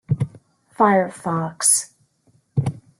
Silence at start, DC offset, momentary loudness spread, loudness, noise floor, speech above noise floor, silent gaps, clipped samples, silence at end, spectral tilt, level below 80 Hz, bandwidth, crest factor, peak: 0.1 s; under 0.1%; 11 LU; -20 LUFS; -61 dBFS; 42 dB; none; under 0.1%; 0.2 s; -4.5 dB/octave; -56 dBFS; 13 kHz; 18 dB; -4 dBFS